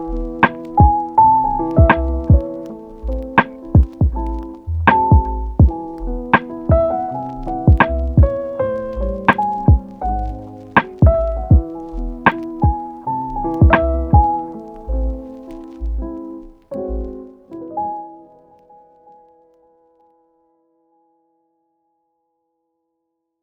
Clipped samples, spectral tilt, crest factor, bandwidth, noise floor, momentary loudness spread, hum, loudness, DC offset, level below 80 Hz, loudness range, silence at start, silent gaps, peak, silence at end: under 0.1%; -10 dB/octave; 16 dB; 4.2 kHz; -75 dBFS; 17 LU; none; -17 LUFS; under 0.1%; -22 dBFS; 14 LU; 0 s; none; 0 dBFS; 5.25 s